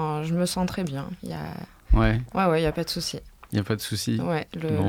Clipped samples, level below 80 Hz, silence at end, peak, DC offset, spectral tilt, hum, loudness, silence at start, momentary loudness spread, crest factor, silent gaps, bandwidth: under 0.1%; -34 dBFS; 0 s; -6 dBFS; under 0.1%; -5.5 dB/octave; none; -26 LUFS; 0 s; 12 LU; 18 dB; none; 18 kHz